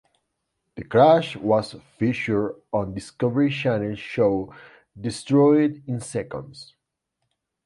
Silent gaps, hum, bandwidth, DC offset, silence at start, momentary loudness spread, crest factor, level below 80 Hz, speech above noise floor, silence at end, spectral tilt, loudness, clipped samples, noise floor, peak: none; none; 11.5 kHz; under 0.1%; 0.75 s; 17 LU; 20 dB; -56 dBFS; 57 dB; 1.05 s; -7 dB/octave; -22 LUFS; under 0.1%; -79 dBFS; -2 dBFS